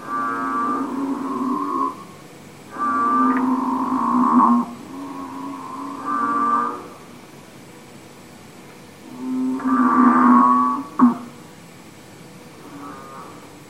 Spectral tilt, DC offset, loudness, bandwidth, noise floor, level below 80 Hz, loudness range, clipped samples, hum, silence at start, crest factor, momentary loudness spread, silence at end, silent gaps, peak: -6 dB/octave; 0.2%; -19 LUFS; 12.5 kHz; -42 dBFS; -64 dBFS; 8 LU; under 0.1%; none; 0 s; 18 dB; 26 LU; 0 s; none; -2 dBFS